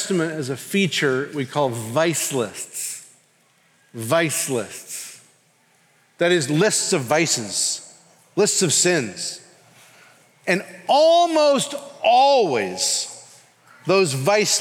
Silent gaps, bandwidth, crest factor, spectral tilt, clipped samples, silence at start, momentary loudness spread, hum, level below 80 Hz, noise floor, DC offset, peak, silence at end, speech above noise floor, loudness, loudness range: none; 18 kHz; 16 dB; -3 dB/octave; under 0.1%; 0 s; 15 LU; none; -76 dBFS; -60 dBFS; under 0.1%; -4 dBFS; 0 s; 40 dB; -20 LUFS; 7 LU